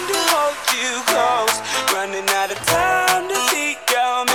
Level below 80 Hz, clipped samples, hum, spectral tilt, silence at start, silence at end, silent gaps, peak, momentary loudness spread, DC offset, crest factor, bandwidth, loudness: -52 dBFS; under 0.1%; none; -1 dB/octave; 0 s; 0 s; none; -2 dBFS; 3 LU; 0.2%; 18 dB; 19 kHz; -18 LUFS